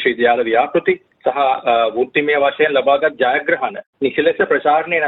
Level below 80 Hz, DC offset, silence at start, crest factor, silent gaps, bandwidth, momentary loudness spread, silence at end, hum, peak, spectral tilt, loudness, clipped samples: -60 dBFS; under 0.1%; 0 s; 14 dB; 3.86-3.93 s; 4.1 kHz; 6 LU; 0 s; none; -2 dBFS; -7.5 dB/octave; -16 LUFS; under 0.1%